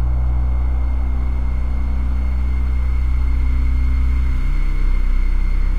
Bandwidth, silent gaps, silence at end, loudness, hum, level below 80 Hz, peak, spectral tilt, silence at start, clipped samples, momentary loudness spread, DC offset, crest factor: 4.6 kHz; none; 0 s; -21 LUFS; none; -16 dBFS; -6 dBFS; -8 dB/octave; 0 s; under 0.1%; 3 LU; 6%; 8 dB